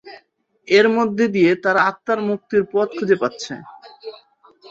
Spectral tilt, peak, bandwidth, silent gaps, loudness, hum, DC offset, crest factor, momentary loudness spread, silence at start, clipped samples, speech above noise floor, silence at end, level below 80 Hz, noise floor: -5.5 dB/octave; -2 dBFS; 7.8 kHz; none; -18 LUFS; none; under 0.1%; 18 dB; 21 LU; 0.05 s; under 0.1%; 39 dB; 0.6 s; -64 dBFS; -57 dBFS